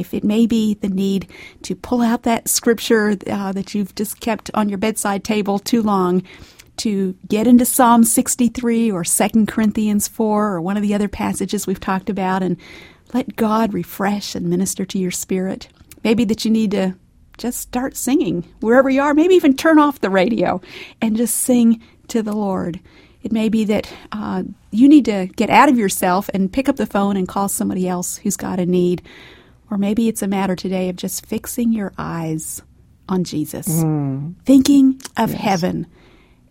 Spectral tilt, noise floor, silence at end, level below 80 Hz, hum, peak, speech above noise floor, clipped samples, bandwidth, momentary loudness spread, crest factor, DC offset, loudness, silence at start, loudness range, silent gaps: -5 dB/octave; -49 dBFS; 0.65 s; -48 dBFS; none; 0 dBFS; 32 dB; under 0.1%; 16.5 kHz; 12 LU; 18 dB; under 0.1%; -18 LUFS; 0 s; 6 LU; none